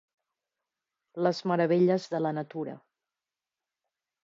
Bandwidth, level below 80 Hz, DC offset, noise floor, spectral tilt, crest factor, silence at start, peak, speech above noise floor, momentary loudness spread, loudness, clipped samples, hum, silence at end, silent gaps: 7.6 kHz; -84 dBFS; under 0.1%; under -90 dBFS; -7.5 dB/octave; 20 dB; 1.15 s; -12 dBFS; over 63 dB; 14 LU; -28 LUFS; under 0.1%; none; 1.45 s; none